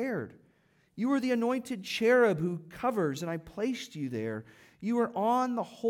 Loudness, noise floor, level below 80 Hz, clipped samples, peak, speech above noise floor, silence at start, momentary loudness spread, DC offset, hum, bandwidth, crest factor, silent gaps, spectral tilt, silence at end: -30 LUFS; -68 dBFS; -70 dBFS; under 0.1%; -14 dBFS; 38 dB; 0 s; 12 LU; under 0.1%; none; 16.5 kHz; 18 dB; none; -6 dB/octave; 0 s